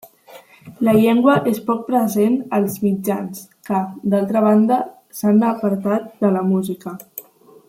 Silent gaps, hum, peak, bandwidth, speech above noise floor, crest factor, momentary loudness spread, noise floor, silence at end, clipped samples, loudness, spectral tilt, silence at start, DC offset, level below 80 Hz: none; none; -2 dBFS; 16.5 kHz; 27 dB; 16 dB; 15 LU; -44 dBFS; 0.45 s; under 0.1%; -18 LUFS; -7 dB/octave; 0.3 s; under 0.1%; -62 dBFS